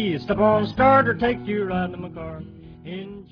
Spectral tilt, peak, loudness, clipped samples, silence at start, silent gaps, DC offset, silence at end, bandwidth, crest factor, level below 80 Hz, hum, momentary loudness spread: -8.5 dB/octave; -4 dBFS; -20 LUFS; under 0.1%; 0 s; none; under 0.1%; 0.1 s; 5.4 kHz; 18 dB; -46 dBFS; none; 20 LU